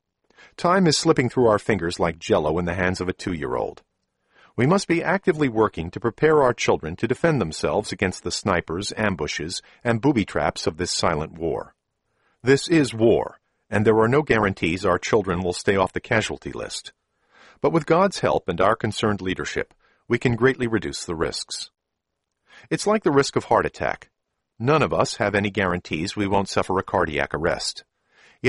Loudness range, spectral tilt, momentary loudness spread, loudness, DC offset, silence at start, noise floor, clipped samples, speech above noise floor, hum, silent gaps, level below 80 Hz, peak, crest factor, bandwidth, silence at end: 3 LU; -5 dB/octave; 9 LU; -22 LUFS; under 0.1%; 0.6 s; -80 dBFS; under 0.1%; 59 dB; none; none; -48 dBFS; -4 dBFS; 20 dB; 11.5 kHz; 0 s